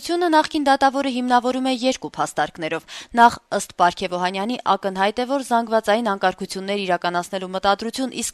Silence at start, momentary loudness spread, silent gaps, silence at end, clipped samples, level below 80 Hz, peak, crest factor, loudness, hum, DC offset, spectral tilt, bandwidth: 0 s; 8 LU; none; 0 s; under 0.1%; -56 dBFS; -2 dBFS; 20 dB; -21 LUFS; none; under 0.1%; -3.5 dB/octave; 13.5 kHz